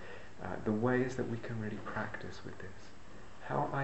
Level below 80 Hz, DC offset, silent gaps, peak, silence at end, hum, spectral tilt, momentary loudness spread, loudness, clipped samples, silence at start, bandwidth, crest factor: -62 dBFS; 0.6%; none; -18 dBFS; 0 s; none; -7 dB/octave; 21 LU; -38 LUFS; under 0.1%; 0 s; 8.2 kHz; 20 dB